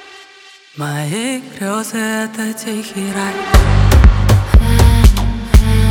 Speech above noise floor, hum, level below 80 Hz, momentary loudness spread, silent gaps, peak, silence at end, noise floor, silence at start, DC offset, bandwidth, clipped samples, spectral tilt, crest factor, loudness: 25 dB; none; -14 dBFS; 12 LU; none; 0 dBFS; 0 s; -41 dBFS; 0.75 s; under 0.1%; 16.5 kHz; under 0.1%; -5.5 dB/octave; 12 dB; -14 LUFS